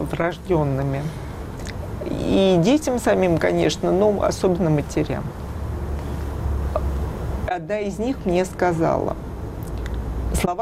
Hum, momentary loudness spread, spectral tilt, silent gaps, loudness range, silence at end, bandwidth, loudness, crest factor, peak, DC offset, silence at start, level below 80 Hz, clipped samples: none; 13 LU; -6.5 dB/octave; none; 6 LU; 0 s; 15.5 kHz; -22 LUFS; 14 dB; -8 dBFS; under 0.1%; 0 s; -32 dBFS; under 0.1%